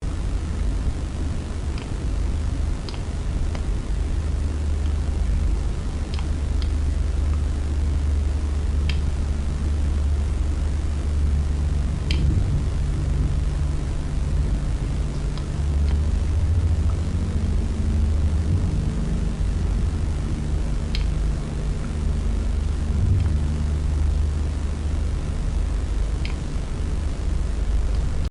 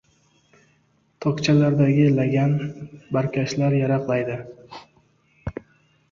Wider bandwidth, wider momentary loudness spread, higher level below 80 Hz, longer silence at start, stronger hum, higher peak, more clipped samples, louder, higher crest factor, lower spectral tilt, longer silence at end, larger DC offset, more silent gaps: first, 11 kHz vs 7.4 kHz; second, 5 LU vs 22 LU; first, -24 dBFS vs -52 dBFS; second, 0 s vs 1.2 s; neither; second, -10 dBFS vs -6 dBFS; neither; second, -25 LUFS vs -21 LUFS; about the same, 12 dB vs 16 dB; about the same, -7 dB/octave vs -7.5 dB/octave; second, 0 s vs 0.6 s; neither; neither